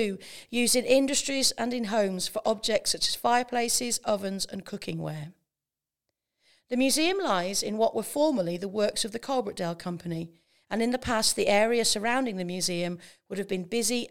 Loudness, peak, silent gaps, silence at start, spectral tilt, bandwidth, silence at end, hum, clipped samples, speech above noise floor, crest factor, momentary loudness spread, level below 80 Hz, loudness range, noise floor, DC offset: -27 LUFS; -8 dBFS; none; 0 s; -3 dB/octave; 18 kHz; 0 s; none; under 0.1%; over 62 dB; 20 dB; 12 LU; -60 dBFS; 5 LU; under -90 dBFS; 0.3%